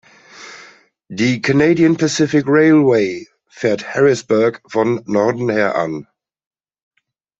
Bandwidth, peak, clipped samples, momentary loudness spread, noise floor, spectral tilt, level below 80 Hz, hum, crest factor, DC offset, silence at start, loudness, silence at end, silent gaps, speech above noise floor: 8 kHz; -2 dBFS; under 0.1%; 16 LU; -45 dBFS; -6 dB/octave; -58 dBFS; none; 14 dB; under 0.1%; 0.35 s; -15 LUFS; 1.4 s; none; 31 dB